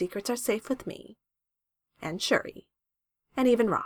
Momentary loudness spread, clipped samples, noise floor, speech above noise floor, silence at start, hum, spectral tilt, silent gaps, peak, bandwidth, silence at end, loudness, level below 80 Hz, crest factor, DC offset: 17 LU; under 0.1%; -87 dBFS; 59 dB; 0 s; none; -4 dB/octave; none; -10 dBFS; 19 kHz; 0 s; -29 LUFS; -64 dBFS; 22 dB; under 0.1%